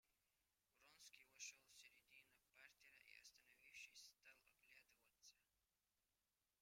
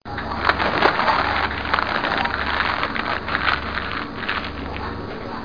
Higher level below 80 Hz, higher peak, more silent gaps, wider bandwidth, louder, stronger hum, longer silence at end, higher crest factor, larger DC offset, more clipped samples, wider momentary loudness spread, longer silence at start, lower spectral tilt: second, under -90 dBFS vs -38 dBFS; second, -44 dBFS vs 0 dBFS; neither; first, 16 kHz vs 5.2 kHz; second, -64 LUFS vs -22 LUFS; first, 50 Hz at -100 dBFS vs none; first, 0.15 s vs 0 s; about the same, 26 dB vs 22 dB; second, under 0.1% vs 0.8%; neither; about the same, 10 LU vs 11 LU; about the same, 0.05 s vs 0 s; second, 2 dB/octave vs -5.5 dB/octave